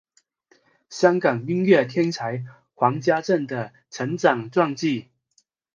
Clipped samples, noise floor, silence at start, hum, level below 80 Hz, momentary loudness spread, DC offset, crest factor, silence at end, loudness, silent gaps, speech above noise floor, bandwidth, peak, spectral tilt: under 0.1%; -66 dBFS; 0.9 s; none; -70 dBFS; 13 LU; under 0.1%; 22 dB; 0.75 s; -22 LUFS; none; 45 dB; 7.6 kHz; -2 dBFS; -6 dB/octave